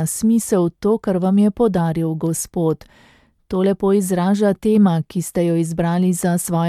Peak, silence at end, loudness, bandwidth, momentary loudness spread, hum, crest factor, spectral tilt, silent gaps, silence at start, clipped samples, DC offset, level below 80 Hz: -4 dBFS; 0 s; -18 LUFS; 15.5 kHz; 6 LU; none; 14 dB; -6.5 dB/octave; none; 0 s; under 0.1%; under 0.1%; -48 dBFS